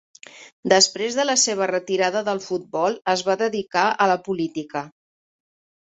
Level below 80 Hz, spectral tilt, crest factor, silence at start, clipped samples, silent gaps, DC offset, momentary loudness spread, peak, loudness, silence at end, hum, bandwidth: -68 dBFS; -2 dB/octave; 20 dB; 0.35 s; under 0.1%; 0.52-0.63 s; under 0.1%; 12 LU; -4 dBFS; -21 LUFS; 0.95 s; none; 8.4 kHz